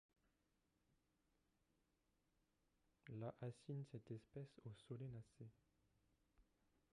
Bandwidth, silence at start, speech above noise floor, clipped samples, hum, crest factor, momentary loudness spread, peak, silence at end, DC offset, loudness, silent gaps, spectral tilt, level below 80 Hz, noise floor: 10.5 kHz; 3.05 s; 31 dB; under 0.1%; none; 20 dB; 11 LU; -40 dBFS; 0.5 s; under 0.1%; -56 LUFS; none; -8 dB/octave; -84 dBFS; -87 dBFS